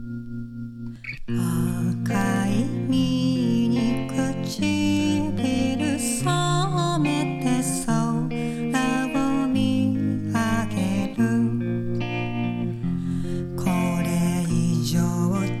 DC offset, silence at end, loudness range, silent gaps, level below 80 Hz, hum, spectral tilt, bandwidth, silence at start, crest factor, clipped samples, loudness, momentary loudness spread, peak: under 0.1%; 0 s; 2 LU; none; -42 dBFS; none; -6 dB/octave; 14.5 kHz; 0 s; 14 dB; under 0.1%; -24 LUFS; 6 LU; -8 dBFS